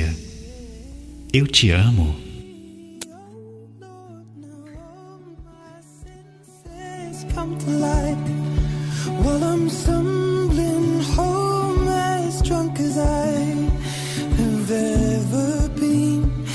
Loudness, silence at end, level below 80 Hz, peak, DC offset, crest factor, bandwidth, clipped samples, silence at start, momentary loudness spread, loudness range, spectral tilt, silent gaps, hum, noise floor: -21 LUFS; 0 s; -30 dBFS; -2 dBFS; under 0.1%; 20 dB; 11 kHz; under 0.1%; 0 s; 22 LU; 20 LU; -5.5 dB/octave; none; none; -46 dBFS